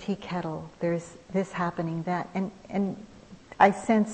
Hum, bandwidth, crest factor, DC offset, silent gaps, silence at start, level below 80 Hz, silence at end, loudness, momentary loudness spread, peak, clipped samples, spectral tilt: none; 8.8 kHz; 24 dB; under 0.1%; none; 0 s; -60 dBFS; 0 s; -28 LUFS; 12 LU; -4 dBFS; under 0.1%; -6.5 dB/octave